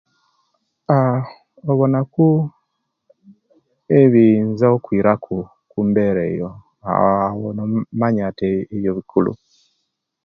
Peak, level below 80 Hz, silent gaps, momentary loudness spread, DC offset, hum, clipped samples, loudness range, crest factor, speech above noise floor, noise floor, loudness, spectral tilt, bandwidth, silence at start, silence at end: 0 dBFS; -52 dBFS; none; 14 LU; under 0.1%; none; under 0.1%; 4 LU; 18 dB; 56 dB; -73 dBFS; -18 LUFS; -11 dB/octave; 5.8 kHz; 0.9 s; 0.9 s